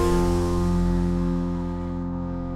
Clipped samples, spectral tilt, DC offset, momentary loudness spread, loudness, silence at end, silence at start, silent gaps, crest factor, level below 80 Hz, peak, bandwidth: under 0.1%; -7.5 dB/octave; under 0.1%; 7 LU; -25 LUFS; 0 s; 0 s; none; 14 dB; -30 dBFS; -10 dBFS; 13 kHz